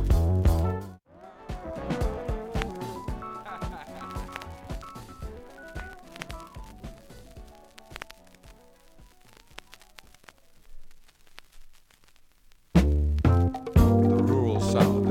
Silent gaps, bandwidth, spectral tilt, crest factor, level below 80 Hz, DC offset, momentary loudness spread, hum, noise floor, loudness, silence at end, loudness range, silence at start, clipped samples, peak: none; 16 kHz; -7.5 dB/octave; 22 dB; -34 dBFS; under 0.1%; 24 LU; none; -56 dBFS; -26 LUFS; 0 s; 24 LU; 0 s; under 0.1%; -6 dBFS